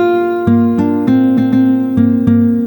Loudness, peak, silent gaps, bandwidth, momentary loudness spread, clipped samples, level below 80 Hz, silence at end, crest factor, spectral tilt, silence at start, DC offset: -12 LUFS; 0 dBFS; none; 19.5 kHz; 2 LU; under 0.1%; -44 dBFS; 0 s; 10 dB; -10 dB/octave; 0 s; under 0.1%